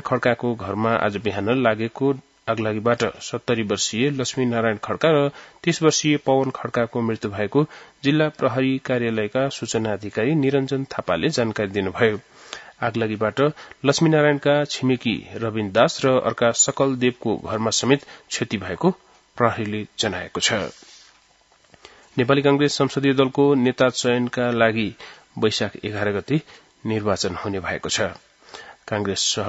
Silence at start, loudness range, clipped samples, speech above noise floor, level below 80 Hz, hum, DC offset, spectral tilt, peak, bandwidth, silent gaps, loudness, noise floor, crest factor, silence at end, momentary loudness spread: 0.05 s; 5 LU; under 0.1%; 36 dB; -60 dBFS; none; under 0.1%; -4.5 dB/octave; 0 dBFS; 8 kHz; none; -22 LUFS; -58 dBFS; 22 dB; 0 s; 9 LU